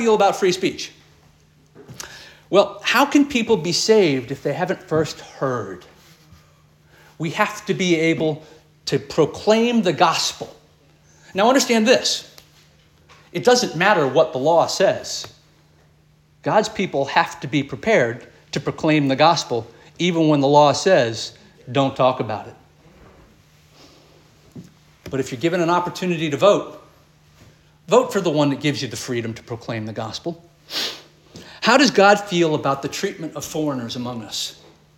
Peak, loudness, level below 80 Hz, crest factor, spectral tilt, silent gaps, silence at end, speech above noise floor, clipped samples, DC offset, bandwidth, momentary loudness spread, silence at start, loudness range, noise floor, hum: -2 dBFS; -19 LUFS; -58 dBFS; 20 dB; -4.5 dB/octave; none; 0.45 s; 37 dB; under 0.1%; under 0.1%; 17 kHz; 14 LU; 0 s; 7 LU; -55 dBFS; none